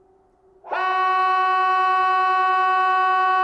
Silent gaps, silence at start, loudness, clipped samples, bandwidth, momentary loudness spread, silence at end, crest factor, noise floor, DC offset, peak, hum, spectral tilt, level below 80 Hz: none; 0.65 s; -19 LUFS; under 0.1%; 8 kHz; 3 LU; 0 s; 8 dB; -57 dBFS; under 0.1%; -12 dBFS; none; -2 dB/octave; -66 dBFS